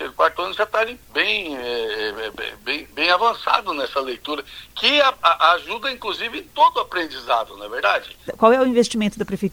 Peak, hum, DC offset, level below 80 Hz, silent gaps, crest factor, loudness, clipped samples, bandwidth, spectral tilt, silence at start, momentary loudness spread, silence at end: 0 dBFS; none; under 0.1%; -54 dBFS; none; 20 dB; -20 LUFS; under 0.1%; over 20 kHz; -3.5 dB/octave; 0 s; 11 LU; 0 s